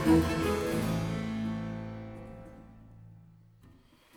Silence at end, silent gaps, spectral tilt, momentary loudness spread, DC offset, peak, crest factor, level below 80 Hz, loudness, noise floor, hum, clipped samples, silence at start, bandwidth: 0.5 s; none; -6.5 dB/octave; 26 LU; under 0.1%; -14 dBFS; 18 dB; -48 dBFS; -32 LUFS; -59 dBFS; none; under 0.1%; 0 s; 18.5 kHz